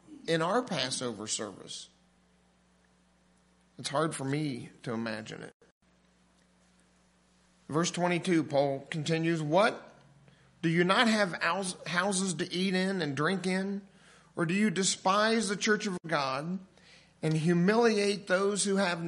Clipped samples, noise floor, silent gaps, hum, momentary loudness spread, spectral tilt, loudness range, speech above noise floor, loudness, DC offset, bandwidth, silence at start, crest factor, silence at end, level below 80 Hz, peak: under 0.1%; -67 dBFS; 5.54-5.60 s, 5.71-5.81 s; none; 13 LU; -4.5 dB/octave; 9 LU; 37 dB; -30 LUFS; under 0.1%; 11.5 kHz; 0.1 s; 22 dB; 0 s; -74 dBFS; -10 dBFS